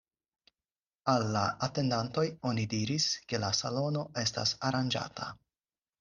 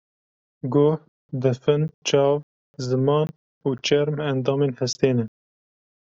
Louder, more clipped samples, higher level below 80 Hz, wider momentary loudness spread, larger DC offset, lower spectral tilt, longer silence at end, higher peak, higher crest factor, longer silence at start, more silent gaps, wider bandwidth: second, -32 LUFS vs -23 LUFS; neither; about the same, -66 dBFS vs -64 dBFS; second, 5 LU vs 10 LU; neither; second, -4.5 dB/octave vs -6 dB/octave; about the same, 0.65 s vs 0.75 s; second, -12 dBFS vs -6 dBFS; about the same, 20 dB vs 18 dB; first, 1.05 s vs 0.65 s; second, none vs 1.08-1.29 s, 1.94-2.02 s, 2.43-2.74 s, 3.36-3.61 s; first, 11 kHz vs 7.8 kHz